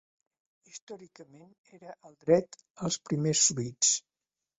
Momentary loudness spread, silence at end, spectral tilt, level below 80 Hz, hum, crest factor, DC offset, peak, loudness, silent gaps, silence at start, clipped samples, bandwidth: 24 LU; 0.6 s; -3.5 dB/octave; -70 dBFS; none; 22 dB; under 0.1%; -10 dBFS; -27 LUFS; 0.82-0.87 s, 1.58-1.64 s, 2.71-2.75 s; 0.75 s; under 0.1%; 8.4 kHz